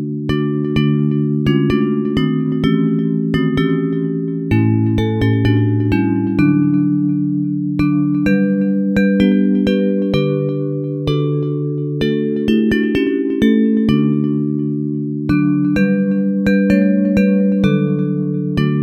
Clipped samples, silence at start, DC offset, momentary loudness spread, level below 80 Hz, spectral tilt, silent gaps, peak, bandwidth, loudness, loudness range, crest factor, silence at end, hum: under 0.1%; 0 s; under 0.1%; 6 LU; -40 dBFS; -9 dB/octave; none; -2 dBFS; 7.8 kHz; -16 LUFS; 2 LU; 14 dB; 0 s; none